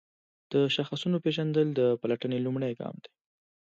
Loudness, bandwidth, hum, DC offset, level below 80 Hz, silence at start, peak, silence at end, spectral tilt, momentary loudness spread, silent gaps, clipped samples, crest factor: -29 LUFS; 7.8 kHz; none; under 0.1%; -76 dBFS; 0.5 s; -14 dBFS; 0.8 s; -7 dB/octave; 9 LU; none; under 0.1%; 16 dB